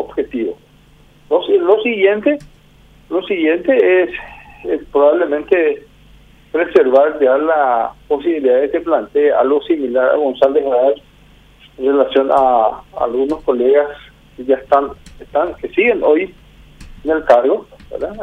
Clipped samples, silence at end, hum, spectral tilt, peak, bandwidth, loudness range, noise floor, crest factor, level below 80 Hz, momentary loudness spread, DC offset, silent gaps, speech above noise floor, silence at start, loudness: under 0.1%; 0 s; none; -6.5 dB/octave; 0 dBFS; 6 kHz; 2 LU; -47 dBFS; 14 dB; -46 dBFS; 11 LU; under 0.1%; none; 33 dB; 0 s; -15 LUFS